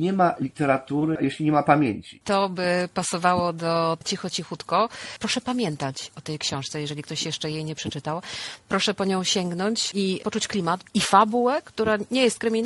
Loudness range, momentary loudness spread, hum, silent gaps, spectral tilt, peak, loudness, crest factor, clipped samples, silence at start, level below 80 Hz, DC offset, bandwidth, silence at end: 5 LU; 10 LU; none; none; -4.5 dB/octave; -2 dBFS; -24 LUFS; 22 dB; under 0.1%; 0 s; -62 dBFS; under 0.1%; 12 kHz; 0 s